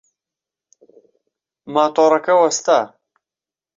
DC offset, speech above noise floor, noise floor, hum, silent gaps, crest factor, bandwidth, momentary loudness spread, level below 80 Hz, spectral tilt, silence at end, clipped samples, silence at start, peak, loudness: under 0.1%; 75 dB; -90 dBFS; none; none; 18 dB; 7.8 kHz; 7 LU; -70 dBFS; -3 dB/octave; 0.9 s; under 0.1%; 1.65 s; -2 dBFS; -16 LUFS